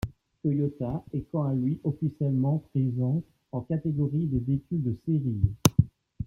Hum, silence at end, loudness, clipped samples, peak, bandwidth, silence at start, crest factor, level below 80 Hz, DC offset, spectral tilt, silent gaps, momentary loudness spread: none; 0 s; -28 LUFS; under 0.1%; -4 dBFS; 16.5 kHz; 0.05 s; 24 dB; -48 dBFS; under 0.1%; -7 dB/octave; none; 9 LU